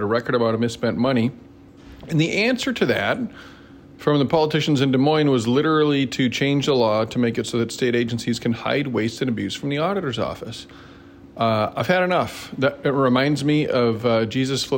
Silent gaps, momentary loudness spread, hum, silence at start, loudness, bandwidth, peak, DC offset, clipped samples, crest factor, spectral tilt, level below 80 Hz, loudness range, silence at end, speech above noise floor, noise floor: none; 7 LU; none; 0 s; -21 LUFS; 16.5 kHz; -6 dBFS; under 0.1%; under 0.1%; 16 dB; -6 dB/octave; -54 dBFS; 5 LU; 0 s; 23 dB; -44 dBFS